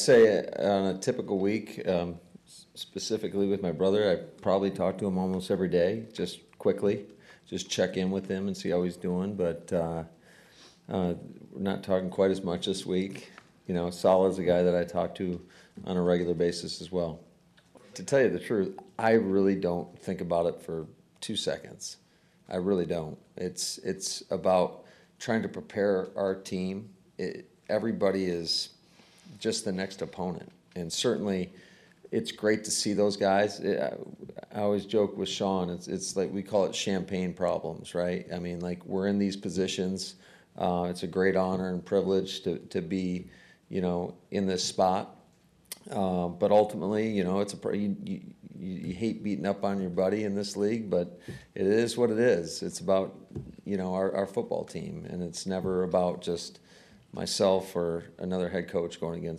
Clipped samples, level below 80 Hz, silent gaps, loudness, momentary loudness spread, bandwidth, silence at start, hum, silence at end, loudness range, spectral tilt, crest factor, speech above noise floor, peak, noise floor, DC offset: under 0.1%; -64 dBFS; none; -30 LUFS; 13 LU; 14 kHz; 0 s; none; 0 s; 4 LU; -5 dB/octave; 18 dB; 33 dB; -12 dBFS; -62 dBFS; under 0.1%